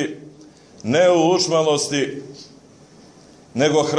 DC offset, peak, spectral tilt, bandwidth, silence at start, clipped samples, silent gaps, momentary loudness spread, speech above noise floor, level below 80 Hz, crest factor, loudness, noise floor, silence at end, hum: under 0.1%; -4 dBFS; -4 dB/octave; 11 kHz; 0 s; under 0.1%; none; 19 LU; 29 dB; -64 dBFS; 16 dB; -18 LUFS; -47 dBFS; 0 s; none